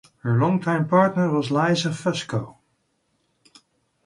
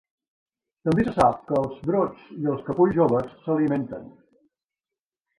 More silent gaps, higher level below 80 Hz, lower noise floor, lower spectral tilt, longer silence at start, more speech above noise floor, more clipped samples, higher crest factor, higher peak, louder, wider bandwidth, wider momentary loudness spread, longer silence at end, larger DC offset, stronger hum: neither; second, -62 dBFS vs -54 dBFS; second, -70 dBFS vs under -90 dBFS; second, -6.5 dB/octave vs -8.5 dB/octave; second, 0.25 s vs 0.85 s; second, 49 dB vs over 67 dB; neither; about the same, 18 dB vs 20 dB; about the same, -6 dBFS vs -6 dBFS; about the same, -22 LUFS vs -24 LUFS; about the same, 11.5 kHz vs 11.5 kHz; about the same, 10 LU vs 10 LU; first, 1.55 s vs 1.3 s; neither; neither